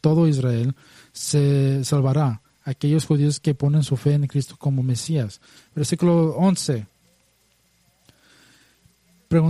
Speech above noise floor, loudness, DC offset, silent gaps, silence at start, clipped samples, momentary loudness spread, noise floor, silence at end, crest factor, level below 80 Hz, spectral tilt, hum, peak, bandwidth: 43 dB; -21 LUFS; under 0.1%; none; 0.05 s; under 0.1%; 11 LU; -63 dBFS; 0 s; 16 dB; -56 dBFS; -7 dB/octave; none; -4 dBFS; 13.5 kHz